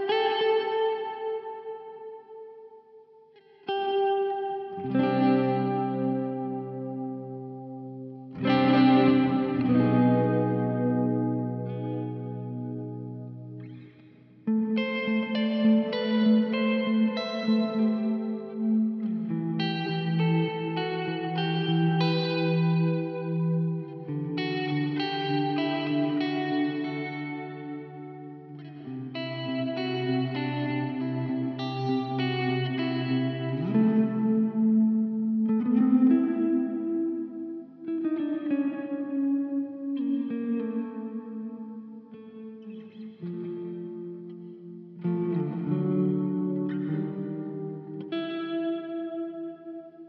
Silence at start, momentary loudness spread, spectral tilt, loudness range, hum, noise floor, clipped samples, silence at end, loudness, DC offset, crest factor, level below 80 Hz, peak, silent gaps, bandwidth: 0 s; 17 LU; -6 dB/octave; 10 LU; none; -55 dBFS; under 0.1%; 0 s; -27 LUFS; under 0.1%; 16 dB; -76 dBFS; -10 dBFS; none; 6 kHz